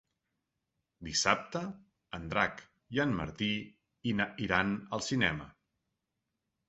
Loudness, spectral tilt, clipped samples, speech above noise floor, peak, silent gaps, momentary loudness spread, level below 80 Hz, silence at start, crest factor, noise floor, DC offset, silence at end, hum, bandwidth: -33 LUFS; -3 dB/octave; under 0.1%; 53 dB; -8 dBFS; none; 15 LU; -58 dBFS; 1 s; 28 dB; -86 dBFS; under 0.1%; 1.15 s; none; 8 kHz